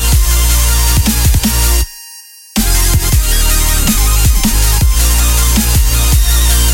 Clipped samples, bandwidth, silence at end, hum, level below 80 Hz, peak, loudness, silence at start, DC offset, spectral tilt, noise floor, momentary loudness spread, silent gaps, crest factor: under 0.1%; 17.5 kHz; 0 s; none; -12 dBFS; 0 dBFS; -11 LUFS; 0 s; under 0.1%; -3 dB/octave; -34 dBFS; 3 LU; none; 10 dB